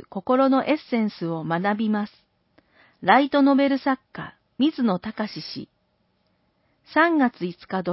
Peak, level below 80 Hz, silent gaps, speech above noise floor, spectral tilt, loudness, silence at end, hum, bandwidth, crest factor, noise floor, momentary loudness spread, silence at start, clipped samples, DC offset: -4 dBFS; -66 dBFS; none; 47 dB; -10 dB/octave; -22 LUFS; 0 s; none; 5.8 kHz; 20 dB; -69 dBFS; 15 LU; 0.15 s; under 0.1%; under 0.1%